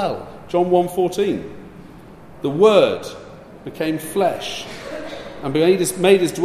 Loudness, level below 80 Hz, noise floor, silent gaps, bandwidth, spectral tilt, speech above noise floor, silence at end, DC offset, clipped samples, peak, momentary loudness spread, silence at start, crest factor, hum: -19 LUFS; -52 dBFS; -41 dBFS; none; 15 kHz; -5 dB/octave; 23 dB; 0 s; under 0.1%; under 0.1%; -2 dBFS; 20 LU; 0 s; 18 dB; none